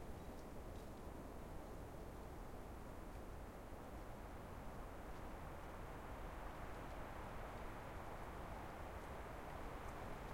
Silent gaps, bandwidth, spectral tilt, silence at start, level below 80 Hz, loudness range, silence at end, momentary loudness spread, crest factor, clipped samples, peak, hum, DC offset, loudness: none; 16.5 kHz; -6 dB/octave; 0 s; -56 dBFS; 2 LU; 0 s; 3 LU; 14 dB; under 0.1%; -38 dBFS; none; under 0.1%; -54 LUFS